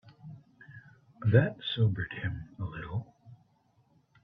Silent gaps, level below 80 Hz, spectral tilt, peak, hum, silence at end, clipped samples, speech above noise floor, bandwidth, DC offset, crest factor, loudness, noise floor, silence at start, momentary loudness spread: none; -58 dBFS; -9.5 dB/octave; -10 dBFS; none; 0.9 s; under 0.1%; 40 dB; 4.8 kHz; under 0.1%; 22 dB; -31 LUFS; -68 dBFS; 0.05 s; 27 LU